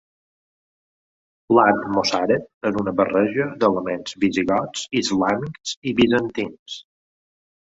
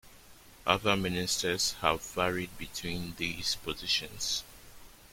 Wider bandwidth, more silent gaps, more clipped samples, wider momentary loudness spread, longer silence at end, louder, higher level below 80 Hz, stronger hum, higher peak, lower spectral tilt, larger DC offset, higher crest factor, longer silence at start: second, 8 kHz vs 16.5 kHz; first, 2.54-2.61 s, 5.77-5.82 s, 6.59-6.66 s vs none; neither; about the same, 11 LU vs 9 LU; first, 0.95 s vs 0.05 s; first, -21 LUFS vs -31 LUFS; about the same, -56 dBFS vs -54 dBFS; neither; first, -2 dBFS vs -8 dBFS; first, -5 dB/octave vs -2.5 dB/octave; neither; about the same, 20 dB vs 24 dB; first, 1.5 s vs 0.05 s